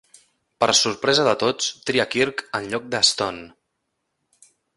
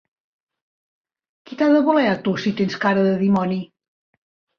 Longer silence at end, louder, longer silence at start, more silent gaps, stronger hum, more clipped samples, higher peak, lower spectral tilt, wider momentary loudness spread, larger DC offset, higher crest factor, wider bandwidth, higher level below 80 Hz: first, 1.3 s vs 0.95 s; about the same, -20 LUFS vs -19 LUFS; second, 0.6 s vs 1.5 s; neither; neither; neither; about the same, -4 dBFS vs -4 dBFS; second, -2 dB/octave vs -7.5 dB/octave; about the same, 9 LU vs 11 LU; neither; about the same, 20 dB vs 16 dB; first, 11.5 kHz vs 6.8 kHz; about the same, -60 dBFS vs -62 dBFS